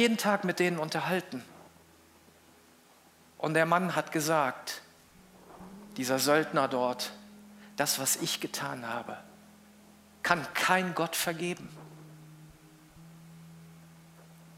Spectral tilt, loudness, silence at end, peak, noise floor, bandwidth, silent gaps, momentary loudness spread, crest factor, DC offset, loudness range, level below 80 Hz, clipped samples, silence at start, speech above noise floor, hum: -3.5 dB/octave; -30 LUFS; 0 s; -8 dBFS; -60 dBFS; 16 kHz; none; 25 LU; 24 dB; under 0.1%; 4 LU; -72 dBFS; under 0.1%; 0 s; 30 dB; none